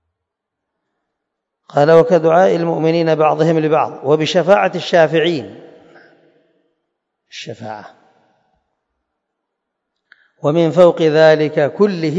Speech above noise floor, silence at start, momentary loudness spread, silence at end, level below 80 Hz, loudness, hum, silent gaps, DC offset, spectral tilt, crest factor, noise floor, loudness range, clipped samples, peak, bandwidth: 65 dB; 1.75 s; 19 LU; 0 s; -66 dBFS; -13 LUFS; none; none; under 0.1%; -6.5 dB/octave; 16 dB; -78 dBFS; 23 LU; under 0.1%; 0 dBFS; 7.8 kHz